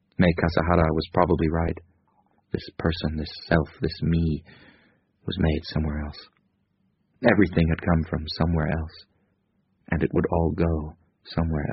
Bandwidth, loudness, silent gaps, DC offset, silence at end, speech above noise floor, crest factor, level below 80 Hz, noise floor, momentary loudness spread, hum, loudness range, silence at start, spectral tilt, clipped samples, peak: 5.8 kHz; -25 LUFS; none; under 0.1%; 0 s; 46 dB; 22 dB; -36 dBFS; -70 dBFS; 12 LU; none; 3 LU; 0.2 s; -6 dB/octave; under 0.1%; -2 dBFS